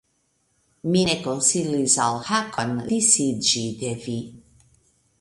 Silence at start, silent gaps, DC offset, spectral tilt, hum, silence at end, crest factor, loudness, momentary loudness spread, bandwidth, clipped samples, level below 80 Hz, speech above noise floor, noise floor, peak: 0.85 s; none; under 0.1%; -3 dB/octave; none; 0.8 s; 22 dB; -21 LUFS; 13 LU; 11.5 kHz; under 0.1%; -58 dBFS; 46 dB; -69 dBFS; -2 dBFS